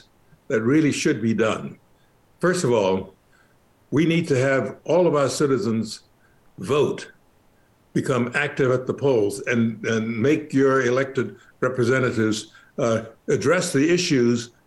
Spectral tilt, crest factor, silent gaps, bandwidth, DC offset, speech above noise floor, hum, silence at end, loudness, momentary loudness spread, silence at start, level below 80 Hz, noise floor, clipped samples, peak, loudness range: -5.5 dB/octave; 12 dB; none; 12.5 kHz; under 0.1%; 37 dB; none; 0.2 s; -22 LUFS; 9 LU; 0.5 s; -62 dBFS; -58 dBFS; under 0.1%; -10 dBFS; 3 LU